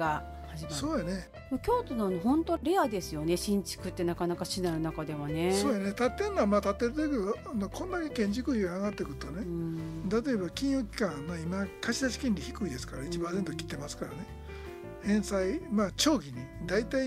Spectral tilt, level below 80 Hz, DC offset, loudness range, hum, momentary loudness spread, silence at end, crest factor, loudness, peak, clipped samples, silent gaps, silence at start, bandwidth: -5 dB/octave; -48 dBFS; under 0.1%; 4 LU; none; 10 LU; 0 s; 18 dB; -32 LUFS; -12 dBFS; under 0.1%; none; 0 s; 15.5 kHz